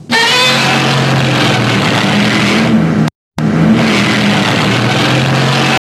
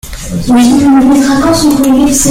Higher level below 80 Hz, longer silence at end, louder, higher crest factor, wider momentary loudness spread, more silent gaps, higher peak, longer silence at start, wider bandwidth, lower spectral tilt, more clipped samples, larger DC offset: second, -44 dBFS vs -28 dBFS; first, 0.15 s vs 0 s; second, -10 LUFS vs -7 LUFS; about the same, 10 dB vs 6 dB; about the same, 3 LU vs 5 LU; first, 3.15-3.31 s vs none; about the same, 0 dBFS vs 0 dBFS; about the same, 0 s vs 0.05 s; second, 13.5 kHz vs 16.5 kHz; about the same, -4.5 dB/octave vs -4.5 dB/octave; neither; neither